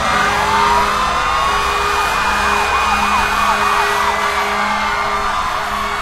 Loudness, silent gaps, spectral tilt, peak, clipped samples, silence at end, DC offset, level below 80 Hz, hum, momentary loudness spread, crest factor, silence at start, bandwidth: -15 LUFS; none; -2.5 dB/octave; -2 dBFS; under 0.1%; 0 s; under 0.1%; -32 dBFS; none; 4 LU; 14 dB; 0 s; 16 kHz